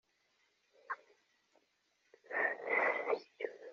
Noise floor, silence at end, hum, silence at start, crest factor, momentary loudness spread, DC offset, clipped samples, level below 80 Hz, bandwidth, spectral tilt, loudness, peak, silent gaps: -78 dBFS; 0 s; none; 0.9 s; 22 dB; 14 LU; under 0.1%; under 0.1%; under -90 dBFS; 7.4 kHz; 0 dB/octave; -37 LUFS; -20 dBFS; none